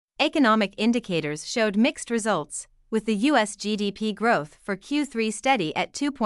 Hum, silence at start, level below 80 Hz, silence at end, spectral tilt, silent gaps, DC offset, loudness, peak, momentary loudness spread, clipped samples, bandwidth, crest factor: none; 0.2 s; -60 dBFS; 0 s; -4 dB/octave; none; under 0.1%; -24 LUFS; -6 dBFS; 7 LU; under 0.1%; 12 kHz; 18 dB